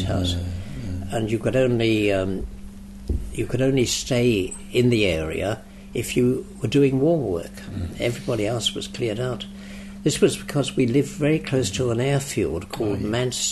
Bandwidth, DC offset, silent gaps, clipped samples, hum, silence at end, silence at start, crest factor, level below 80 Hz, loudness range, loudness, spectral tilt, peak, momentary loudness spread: 12.5 kHz; under 0.1%; none; under 0.1%; none; 0 s; 0 s; 18 dB; -40 dBFS; 3 LU; -23 LUFS; -5 dB/octave; -6 dBFS; 12 LU